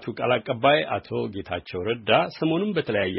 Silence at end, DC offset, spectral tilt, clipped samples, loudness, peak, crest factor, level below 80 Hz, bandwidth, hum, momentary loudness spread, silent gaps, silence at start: 0 s; under 0.1%; -3.5 dB/octave; under 0.1%; -24 LUFS; -6 dBFS; 20 dB; -58 dBFS; 5.8 kHz; none; 10 LU; none; 0 s